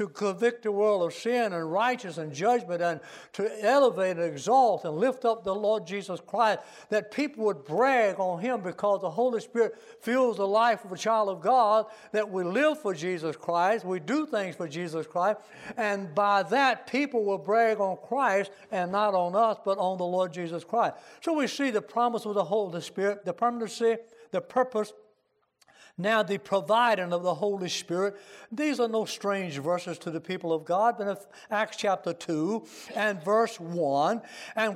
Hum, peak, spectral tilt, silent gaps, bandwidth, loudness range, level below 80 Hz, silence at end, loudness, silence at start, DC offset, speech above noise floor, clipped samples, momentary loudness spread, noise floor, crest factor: none; -10 dBFS; -5 dB/octave; none; 15 kHz; 4 LU; -78 dBFS; 0 s; -28 LUFS; 0 s; under 0.1%; 45 dB; under 0.1%; 10 LU; -72 dBFS; 16 dB